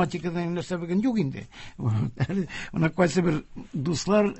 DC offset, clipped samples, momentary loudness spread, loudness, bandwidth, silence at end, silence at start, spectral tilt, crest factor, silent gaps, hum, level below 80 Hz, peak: under 0.1%; under 0.1%; 9 LU; -27 LUFS; 8.4 kHz; 0 s; 0 s; -6.5 dB/octave; 20 dB; none; none; -52 dBFS; -6 dBFS